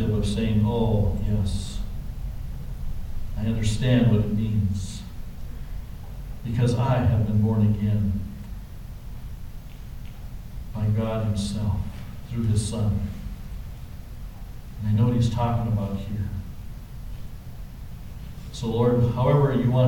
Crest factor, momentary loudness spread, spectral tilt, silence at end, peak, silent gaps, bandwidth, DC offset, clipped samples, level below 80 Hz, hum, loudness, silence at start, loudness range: 16 dB; 19 LU; -7.5 dB/octave; 0 s; -8 dBFS; none; 16.5 kHz; under 0.1%; under 0.1%; -34 dBFS; none; -25 LUFS; 0 s; 6 LU